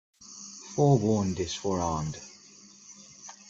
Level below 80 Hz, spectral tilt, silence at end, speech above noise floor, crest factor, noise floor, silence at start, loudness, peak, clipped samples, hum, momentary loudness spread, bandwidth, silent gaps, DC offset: -56 dBFS; -6 dB/octave; 0.15 s; 27 dB; 20 dB; -53 dBFS; 0.2 s; -28 LUFS; -10 dBFS; under 0.1%; none; 24 LU; 7.8 kHz; none; under 0.1%